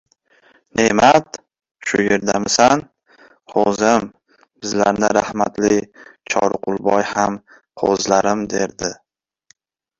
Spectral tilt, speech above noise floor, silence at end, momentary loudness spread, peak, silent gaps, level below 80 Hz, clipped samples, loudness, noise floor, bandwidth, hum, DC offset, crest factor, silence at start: -3.5 dB/octave; 41 dB; 1.05 s; 12 LU; 0 dBFS; none; -52 dBFS; under 0.1%; -17 LUFS; -58 dBFS; 8.2 kHz; none; under 0.1%; 18 dB; 0.75 s